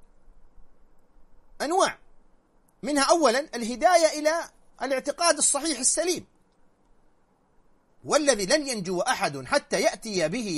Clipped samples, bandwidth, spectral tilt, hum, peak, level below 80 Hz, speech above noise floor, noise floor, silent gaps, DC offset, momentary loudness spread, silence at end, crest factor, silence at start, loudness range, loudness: under 0.1%; 13.5 kHz; -2 dB/octave; none; -4 dBFS; -56 dBFS; 39 dB; -63 dBFS; none; under 0.1%; 12 LU; 0 s; 22 dB; 0.3 s; 4 LU; -24 LUFS